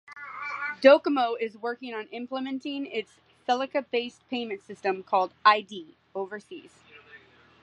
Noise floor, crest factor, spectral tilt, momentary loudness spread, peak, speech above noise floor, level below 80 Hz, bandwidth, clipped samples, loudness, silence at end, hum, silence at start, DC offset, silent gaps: -54 dBFS; 24 dB; -4.5 dB/octave; 19 LU; -4 dBFS; 27 dB; -78 dBFS; 9 kHz; under 0.1%; -27 LUFS; 0.45 s; none; 0.1 s; under 0.1%; none